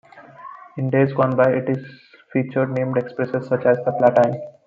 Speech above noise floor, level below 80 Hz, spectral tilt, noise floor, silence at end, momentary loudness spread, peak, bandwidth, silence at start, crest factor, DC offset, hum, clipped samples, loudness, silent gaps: 21 dB; -64 dBFS; -9.5 dB/octave; -41 dBFS; 0.15 s; 12 LU; -2 dBFS; 7.2 kHz; 0.15 s; 18 dB; under 0.1%; none; under 0.1%; -20 LUFS; none